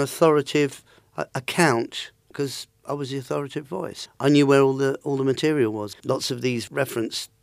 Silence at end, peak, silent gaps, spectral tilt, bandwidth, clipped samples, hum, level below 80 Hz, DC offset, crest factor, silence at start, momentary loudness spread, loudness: 0.15 s; -4 dBFS; none; -5 dB/octave; 15.5 kHz; under 0.1%; none; -68 dBFS; under 0.1%; 20 dB; 0 s; 14 LU; -23 LUFS